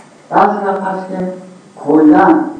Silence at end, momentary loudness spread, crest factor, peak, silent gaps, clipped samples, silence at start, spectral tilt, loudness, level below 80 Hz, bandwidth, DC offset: 0 s; 16 LU; 12 dB; 0 dBFS; none; under 0.1%; 0.3 s; -8 dB/octave; -12 LUFS; -52 dBFS; 8.6 kHz; under 0.1%